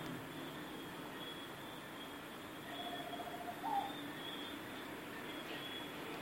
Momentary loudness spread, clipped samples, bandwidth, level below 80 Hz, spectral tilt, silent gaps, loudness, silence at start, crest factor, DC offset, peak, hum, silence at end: 8 LU; under 0.1%; 16.5 kHz; -74 dBFS; -4 dB/octave; none; -46 LUFS; 0 s; 18 dB; under 0.1%; -28 dBFS; none; 0 s